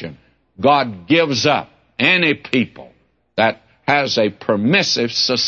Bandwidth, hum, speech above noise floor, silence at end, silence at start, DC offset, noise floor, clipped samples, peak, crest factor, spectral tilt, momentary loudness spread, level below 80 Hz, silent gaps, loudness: 7.6 kHz; none; 25 dB; 0 s; 0 s; under 0.1%; -41 dBFS; under 0.1%; -2 dBFS; 16 dB; -4 dB/octave; 9 LU; -60 dBFS; none; -16 LUFS